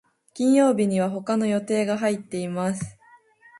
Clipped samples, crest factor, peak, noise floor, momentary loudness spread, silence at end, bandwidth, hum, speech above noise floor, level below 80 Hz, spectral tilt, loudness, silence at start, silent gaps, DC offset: under 0.1%; 16 dB; -8 dBFS; -54 dBFS; 10 LU; 0.7 s; 11.5 kHz; none; 32 dB; -64 dBFS; -6 dB/octave; -23 LUFS; 0.35 s; none; under 0.1%